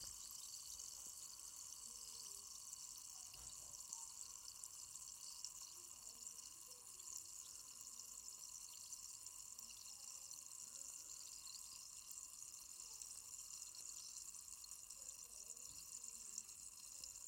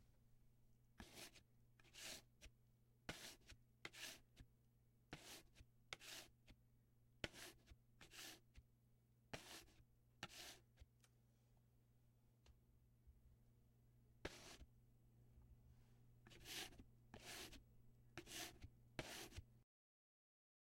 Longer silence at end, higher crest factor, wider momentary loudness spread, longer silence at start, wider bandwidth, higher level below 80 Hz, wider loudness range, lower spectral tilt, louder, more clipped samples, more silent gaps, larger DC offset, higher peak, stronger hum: second, 0 s vs 1 s; second, 24 dB vs 36 dB; second, 3 LU vs 12 LU; about the same, 0 s vs 0 s; about the same, 17 kHz vs 16 kHz; second, -80 dBFS vs -74 dBFS; second, 1 LU vs 7 LU; second, 1.5 dB/octave vs -2.5 dB/octave; first, -53 LUFS vs -58 LUFS; neither; neither; neither; second, -32 dBFS vs -28 dBFS; neither